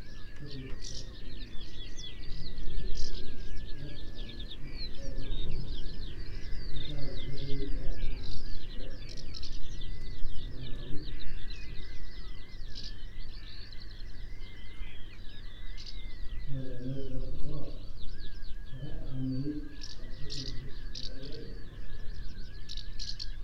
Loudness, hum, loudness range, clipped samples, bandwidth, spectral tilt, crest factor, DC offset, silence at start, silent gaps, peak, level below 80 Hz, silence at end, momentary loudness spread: -43 LUFS; none; 6 LU; under 0.1%; 6.6 kHz; -5 dB/octave; 14 dB; under 0.1%; 0 s; none; -10 dBFS; -38 dBFS; 0 s; 8 LU